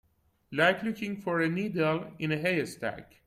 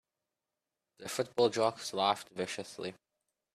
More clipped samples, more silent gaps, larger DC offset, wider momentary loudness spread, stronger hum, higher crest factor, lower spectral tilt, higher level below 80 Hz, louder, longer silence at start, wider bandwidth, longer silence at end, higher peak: neither; neither; neither; second, 10 LU vs 14 LU; neither; about the same, 18 dB vs 22 dB; first, -6 dB/octave vs -3.5 dB/octave; first, -66 dBFS vs -78 dBFS; first, -30 LUFS vs -34 LUFS; second, 0.5 s vs 1 s; about the same, 14.5 kHz vs 14.5 kHz; second, 0.2 s vs 0.6 s; about the same, -12 dBFS vs -14 dBFS